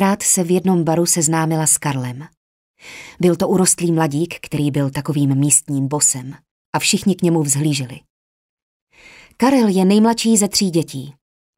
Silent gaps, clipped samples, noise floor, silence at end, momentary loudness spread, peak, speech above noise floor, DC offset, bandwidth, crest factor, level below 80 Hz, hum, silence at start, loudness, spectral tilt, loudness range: 2.37-2.74 s, 6.51-6.73 s, 8.10-8.87 s; under 0.1%; -45 dBFS; 0.45 s; 11 LU; 0 dBFS; 29 dB; under 0.1%; 16 kHz; 18 dB; -56 dBFS; none; 0 s; -16 LUFS; -4.5 dB/octave; 2 LU